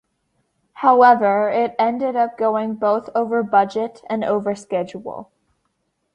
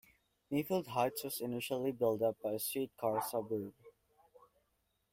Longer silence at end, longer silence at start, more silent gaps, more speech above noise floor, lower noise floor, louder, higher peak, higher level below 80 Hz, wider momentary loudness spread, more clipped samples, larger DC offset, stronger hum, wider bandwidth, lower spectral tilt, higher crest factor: second, 0.9 s vs 1.2 s; first, 0.75 s vs 0.5 s; neither; first, 53 dB vs 44 dB; second, -71 dBFS vs -80 dBFS; first, -18 LUFS vs -37 LUFS; first, -2 dBFS vs -20 dBFS; first, -66 dBFS vs -76 dBFS; first, 13 LU vs 6 LU; neither; neither; neither; second, 10 kHz vs 16.5 kHz; first, -6.5 dB/octave vs -5 dB/octave; about the same, 18 dB vs 18 dB